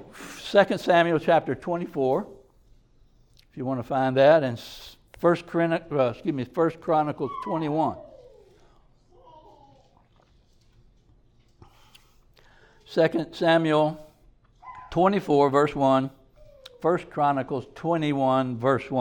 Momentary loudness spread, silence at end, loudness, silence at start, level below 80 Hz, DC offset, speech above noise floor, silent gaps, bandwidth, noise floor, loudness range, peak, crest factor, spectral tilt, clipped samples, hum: 14 LU; 0 s; -24 LUFS; 0 s; -58 dBFS; under 0.1%; 37 dB; none; 19 kHz; -60 dBFS; 7 LU; -6 dBFS; 20 dB; -7 dB/octave; under 0.1%; none